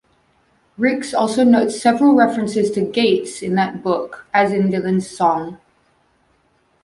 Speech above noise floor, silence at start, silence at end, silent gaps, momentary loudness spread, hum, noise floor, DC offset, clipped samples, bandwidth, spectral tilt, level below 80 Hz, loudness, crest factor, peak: 44 dB; 0.8 s; 1.25 s; none; 8 LU; none; -61 dBFS; under 0.1%; under 0.1%; 11.5 kHz; -5.5 dB/octave; -58 dBFS; -17 LUFS; 16 dB; -2 dBFS